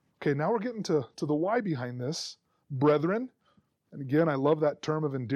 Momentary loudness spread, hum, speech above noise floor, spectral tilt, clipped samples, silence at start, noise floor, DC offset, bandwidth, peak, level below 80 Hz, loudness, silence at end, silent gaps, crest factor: 13 LU; none; 40 dB; -6.5 dB/octave; under 0.1%; 0.2 s; -69 dBFS; under 0.1%; 11.5 kHz; -14 dBFS; -76 dBFS; -29 LUFS; 0 s; none; 16 dB